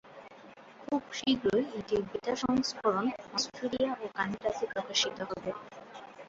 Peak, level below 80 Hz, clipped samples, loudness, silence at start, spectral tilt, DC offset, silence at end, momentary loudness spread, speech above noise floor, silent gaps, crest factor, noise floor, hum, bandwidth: -14 dBFS; -64 dBFS; under 0.1%; -32 LUFS; 0.05 s; -3.5 dB/octave; under 0.1%; 0 s; 19 LU; 21 dB; none; 18 dB; -53 dBFS; none; 8 kHz